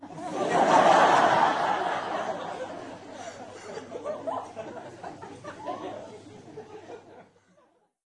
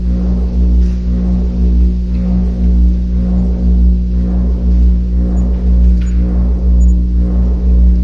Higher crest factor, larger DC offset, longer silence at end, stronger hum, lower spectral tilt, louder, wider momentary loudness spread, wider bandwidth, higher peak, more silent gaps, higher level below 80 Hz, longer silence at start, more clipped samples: first, 20 dB vs 10 dB; neither; first, 0.85 s vs 0 s; second, none vs 60 Hz at -15 dBFS; second, -4 dB/octave vs -10 dB/octave; second, -25 LUFS vs -13 LUFS; first, 25 LU vs 3 LU; first, 11 kHz vs 1.7 kHz; second, -8 dBFS vs 0 dBFS; neither; second, -74 dBFS vs -10 dBFS; about the same, 0 s vs 0 s; neither